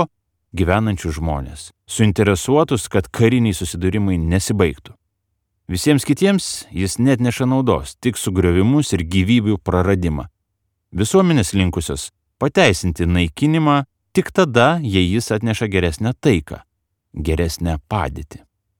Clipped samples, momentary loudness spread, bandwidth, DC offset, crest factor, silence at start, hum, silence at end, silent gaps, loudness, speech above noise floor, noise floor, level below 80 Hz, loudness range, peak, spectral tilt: under 0.1%; 12 LU; 18 kHz; under 0.1%; 18 dB; 0 s; none; 0.4 s; none; -18 LUFS; 56 dB; -73 dBFS; -34 dBFS; 2 LU; 0 dBFS; -5.5 dB/octave